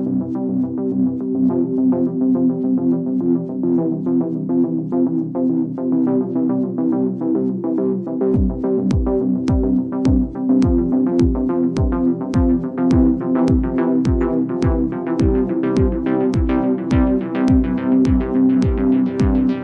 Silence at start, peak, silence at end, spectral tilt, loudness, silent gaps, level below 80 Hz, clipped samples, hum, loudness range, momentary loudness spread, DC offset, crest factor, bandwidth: 0 s; -4 dBFS; 0 s; -9.5 dB/octave; -18 LUFS; none; -28 dBFS; under 0.1%; none; 2 LU; 4 LU; under 0.1%; 14 dB; 6.8 kHz